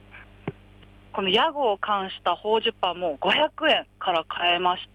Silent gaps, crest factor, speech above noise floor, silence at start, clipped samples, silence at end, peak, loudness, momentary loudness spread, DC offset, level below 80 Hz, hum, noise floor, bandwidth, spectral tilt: none; 16 dB; 26 dB; 0.1 s; under 0.1%; 0.1 s; -10 dBFS; -23 LUFS; 13 LU; under 0.1%; -58 dBFS; none; -50 dBFS; 11.5 kHz; -5 dB/octave